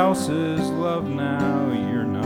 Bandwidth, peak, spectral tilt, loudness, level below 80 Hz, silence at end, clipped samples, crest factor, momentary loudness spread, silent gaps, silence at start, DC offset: 17 kHz; -6 dBFS; -6.5 dB/octave; -23 LUFS; -54 dBFS; 0 s; under 0.1%; 16 dB; 3 LU; none; 0 s; under 0.1%